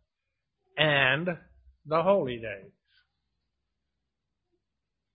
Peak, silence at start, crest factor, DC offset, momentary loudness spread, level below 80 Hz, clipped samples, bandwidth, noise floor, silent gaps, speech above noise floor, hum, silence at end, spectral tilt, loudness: -4 dBFS; 0.75 s; 26 dB; under 0.1%; 18 LU; -64 dBFS; under 0.1%; 4.6 kHz; -85 dBFS; none; 57 dB; none; 2.5 s; -9 dB/octave; -26 LUFS